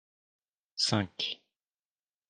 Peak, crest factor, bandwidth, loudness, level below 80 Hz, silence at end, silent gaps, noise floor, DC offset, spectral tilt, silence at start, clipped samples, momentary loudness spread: -12 dBFS; 24 dB; 11 kHz; -31 LUFS; -74 dBFS; 0.95 s; none; under -90 dBFS; under 0.1%; -3.5 dB/octave; 0.75 s; under 0.1%; 15 LU